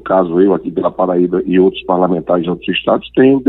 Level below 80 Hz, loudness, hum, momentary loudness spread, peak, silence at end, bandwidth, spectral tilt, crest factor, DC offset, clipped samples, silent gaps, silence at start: -46 dBFS; -14 LUFS; none; 5 LU; 0 dBFS; 0 s; 4.1 kHz; -10 dB/octave; 12 dB; under 0.1%; under 0.1%; none; 0.05 s